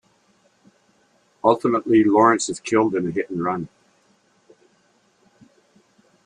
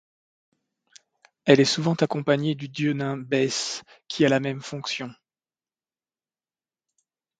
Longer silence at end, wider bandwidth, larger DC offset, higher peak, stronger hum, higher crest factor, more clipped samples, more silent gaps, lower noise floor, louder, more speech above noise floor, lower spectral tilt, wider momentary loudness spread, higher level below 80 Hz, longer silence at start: first, 2.6 s vs 2.25 s; about the same, 10 kHz vs 9.4 kHz; neither; about the same, -2 dBFS vs 0 dBFS; neither; about the same, 22 dB vs 26 dB; neither; neither; second, -62 dBFS vs under -90 dBFS; first, -20 LUFS vs -24 LUFS; second, 43 dB vs over 66 dB; about the same, -5.5 dB/octave vs -5 dB/octave; second, 10 LU vs 13 LU; first, -64 dBFS vs -70 dBFS; about the same, 1.45 s vs 1.45 s